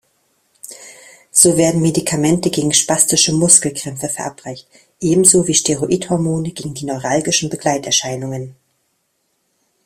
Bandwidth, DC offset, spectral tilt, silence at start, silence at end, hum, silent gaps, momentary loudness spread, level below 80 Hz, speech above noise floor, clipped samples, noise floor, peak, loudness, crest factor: 16 kHz; under 0.1%; -3.5 dB/octave; 0.65 s; 1.35 s; none; none; 20 LU; -52 dBFS; 51 dB; under 0.1%; -67 dBFS; 0 dBFS; -14 LUFS; 18 dB